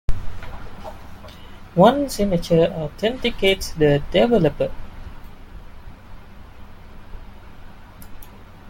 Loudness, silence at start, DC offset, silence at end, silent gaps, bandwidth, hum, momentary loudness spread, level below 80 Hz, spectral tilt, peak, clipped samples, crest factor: -19 LUFS; 0.1 s; under 0.1%; 0 s; none; 17 kHz; none; 26 LU; -34 dBFS; -6 dB/octave; -2 dBFS; under 0.1%; 20 dB